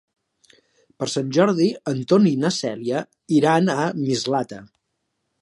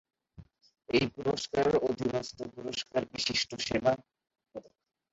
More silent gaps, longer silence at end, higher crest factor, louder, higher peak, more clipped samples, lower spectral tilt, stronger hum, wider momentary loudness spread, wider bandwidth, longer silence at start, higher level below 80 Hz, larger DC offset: neither; first, 0.75 s vs 0.5 s; about the same, 18 dB vs 22 dB; first, -21 LUFS vs -31 LUFS; first, -4 dBFS vs -12 dBFS; neither; first, -5.5 dB/octave vs -4 dB/octave; neither; second, 10 LU vs 15 LU; first, 11.5 kHz vs 8 kHz; first, 1 s vs 0.4 s; second, -68 dBFS vs -60 dBFS; neither